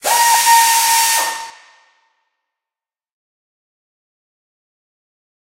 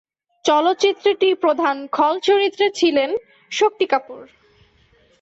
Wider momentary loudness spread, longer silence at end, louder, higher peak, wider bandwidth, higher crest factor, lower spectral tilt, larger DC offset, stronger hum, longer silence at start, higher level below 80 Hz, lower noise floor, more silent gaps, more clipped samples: first, 16 LU vs 7 LU; first, 4 s vs 0.95 s; first, -11 LUFS vs -18 LUFS; first, 0 dBFS vs -4 dBFS; first, 16 kHz vs 8 kHz; about the same, 18 dB vs 14 dB; second, 3 dB/octave vs -2 dB/octave; neither; neither; second, 0.05 s vs 0.45 s; about the same, -64 dBFS vs -66 dBFS; first, -90 dBFS vs -56 dBFS; neither; neither